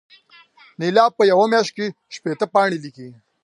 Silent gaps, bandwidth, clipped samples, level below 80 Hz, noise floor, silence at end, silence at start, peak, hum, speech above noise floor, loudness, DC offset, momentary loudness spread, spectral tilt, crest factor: none; 11 kHz; under 0.1%; -74 dBFS; -50 dBFS; 0.35 s; 0.8 s; -2 dBFS; none; 32 dB; -18 LUFS; under 0.1%; 14 LU; -5 dB/octave; 18 dB